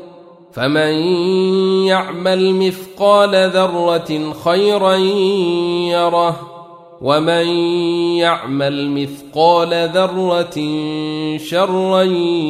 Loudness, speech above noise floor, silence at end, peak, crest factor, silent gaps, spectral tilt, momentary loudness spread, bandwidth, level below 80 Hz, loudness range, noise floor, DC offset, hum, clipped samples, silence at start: -15 LUFS; 25 dB; 0 s; -2 dBFS; 14 dB; none; -5.5 dB/octave; 8 LU; 15 kHz; -60 dBFS; 2 LU; -40 dBFS; under 0.1%; none; under 0.1%; 0 s